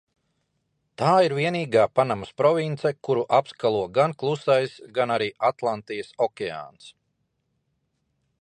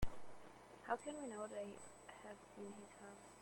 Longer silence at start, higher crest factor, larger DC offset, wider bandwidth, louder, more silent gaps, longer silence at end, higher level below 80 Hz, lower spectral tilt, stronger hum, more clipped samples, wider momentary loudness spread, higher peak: first, 1 s vs 0 s; about the same, 18 dB vs 20 dB; neither; second, 11 kHz vs 16.5 kHz; first, -23 LUFS vs -52 LUFS; neither; first, 1.5 s vs 0 s; second, -66 dBFS vs -60 dBFS; about the same, -6 dB/octave vs -5 dB/octave; neither; neither; second, 9 LU vs 14 LU; first, -6 dBFS vs -26 dBFS